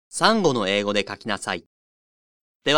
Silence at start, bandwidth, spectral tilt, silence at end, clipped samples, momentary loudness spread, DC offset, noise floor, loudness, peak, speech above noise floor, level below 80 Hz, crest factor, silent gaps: 0.1 s; 18.5 kHz; -3.5 dB/octave; 0 s; under 0.1%; 10 LU; under 0.1%; under -90 dBFS; -23 LUFS; -2 dBFS; over 68 dB; -60 dBFS; 22 dB; 1.66-2.60 s